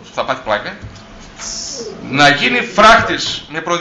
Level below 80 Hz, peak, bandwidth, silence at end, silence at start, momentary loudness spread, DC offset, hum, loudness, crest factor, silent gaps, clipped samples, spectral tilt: -40 dBFS; 0 dBFS; 10 kHz; 0 s; 0 s; 18 LU; under 0.1%; none; -13 LUFS; 14 dB; none; under 0.1%; -3 dB/octave